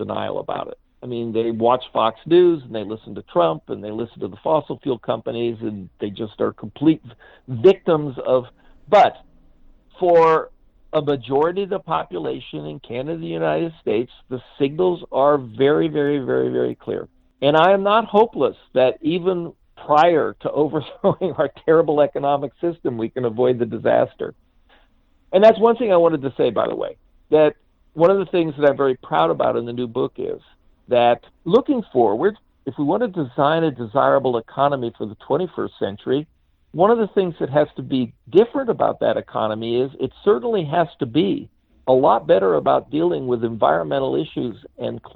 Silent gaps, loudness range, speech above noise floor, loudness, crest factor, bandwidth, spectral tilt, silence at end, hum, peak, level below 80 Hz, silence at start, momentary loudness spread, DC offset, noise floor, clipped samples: none; 5 LU; 38 dB; -20 LUFS; 18 dB; 6.8 kHz; -8.5 dB/octave; 0.1 s; none; 0 dBFS; -56 dBFS; 0 s; 14 LU; under 0.1%; -57 dBFS; under 0.1%